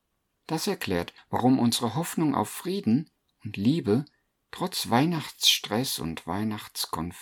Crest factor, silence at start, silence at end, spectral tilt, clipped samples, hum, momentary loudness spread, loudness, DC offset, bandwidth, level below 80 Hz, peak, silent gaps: 20 dB; 0.5 s; 0 s; -4.5 dB/octave; under 0.1%; none; 11 LU; -27 LUFS; under 0.1%; 19 kHz; -60 dBFS; -6 dBFS; none